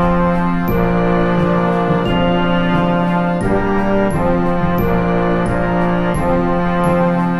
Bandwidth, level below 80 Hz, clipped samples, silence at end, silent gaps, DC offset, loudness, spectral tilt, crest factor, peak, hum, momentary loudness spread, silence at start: 13 kHz; -28 dBFS; under 0.1%; 0 s; none; under 0.1%; -15 LUFS; -8 dB/octave; 12 dB; -2 dBFS; none; 2 LU; 0 s